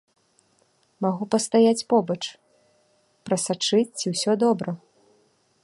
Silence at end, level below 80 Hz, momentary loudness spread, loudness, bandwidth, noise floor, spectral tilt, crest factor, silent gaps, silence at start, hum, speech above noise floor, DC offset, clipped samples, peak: 0.85 s; -72 dBFS; 13 LU; -23 LUFS; 11.5 kHz; -65 dBFS; -4.5 dB/octave; 18 dB; none; 1 s; none; 43 dB; under 0.1%; under 0.1%; -8 dBFS